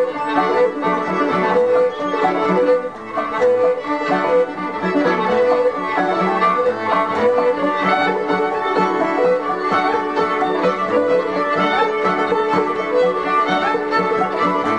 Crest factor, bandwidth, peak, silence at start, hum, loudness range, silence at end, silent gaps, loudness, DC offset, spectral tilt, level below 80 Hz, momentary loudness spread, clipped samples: 14 dB; 9.6 kHz; -4 dBFS; 0 s; none; 1 LU; 0 s; none; -17 LUFS; 0.3%; -6 dB/octave; -56 dBFS; 3 LU; under 0.1%